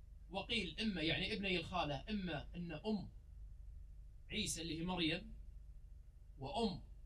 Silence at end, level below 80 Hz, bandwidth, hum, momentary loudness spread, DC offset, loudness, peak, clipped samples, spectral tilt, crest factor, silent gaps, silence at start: 0 s; -54 dBFS; 13 kHz; none; 21 LU; under 0.1%; -42 LUFS; -26 dBFS; under 0.1%; -4 dB/octave; 18 dB; none; 0 s